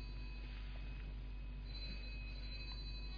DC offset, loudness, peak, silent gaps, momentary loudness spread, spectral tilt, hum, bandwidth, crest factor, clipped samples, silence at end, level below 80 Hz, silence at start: under 0.1%; -50 LUFS; -38 dBFS; none; 3 LU; -4 dB/octave; none; 5.2 kHz; 10 dB; under 0.1%; 0 s; -48 dBFS; 0 s